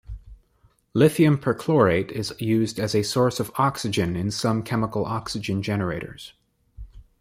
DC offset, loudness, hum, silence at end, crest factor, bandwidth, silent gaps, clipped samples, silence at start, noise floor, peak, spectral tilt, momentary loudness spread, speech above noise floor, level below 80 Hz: under 0.1%; -23 LUFS; none; 0.2 s; 20 dB; 16 kHz; none; under 0.1%; 0.1 s; -62 dBFS; -4 dBFS; -6 dB/octave; 11 LU; 39 dB; -48 dBFS